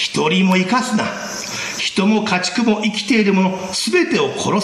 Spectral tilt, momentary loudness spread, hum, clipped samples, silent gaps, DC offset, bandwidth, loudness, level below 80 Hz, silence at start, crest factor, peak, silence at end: -4.5 dB/octave; 8 LU; none; under 0.1%; none; under 0.1%; 14.5 kHz; -17 LUFS; -56 dBFS; 0 s; 12 dB; -4 dBFS; 0 s